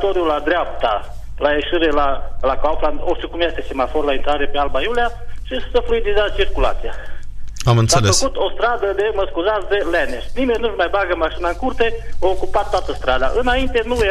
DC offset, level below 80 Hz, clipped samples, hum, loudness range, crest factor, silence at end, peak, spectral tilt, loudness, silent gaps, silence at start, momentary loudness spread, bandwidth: under 0.1%; -26 dBFS; under 0.1%; 50 Hz at -35 dBFS; 3 LU; 14 dB; 0 s; -2 dBFS; -4.5 dB/octave; -19 LUFS; none; 0 s; 7 LU; 12 kHz